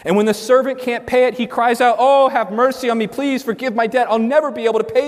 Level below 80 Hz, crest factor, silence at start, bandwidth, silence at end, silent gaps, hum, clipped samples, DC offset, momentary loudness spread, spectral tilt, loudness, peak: -58 dBFS; 14 dB; 0.05 s; 15.5 kHz; 0 s; none; none; under 0.1%; under 0.1%; 7 LU; -5 dB/octave; -16 LUFS; -2 dBFS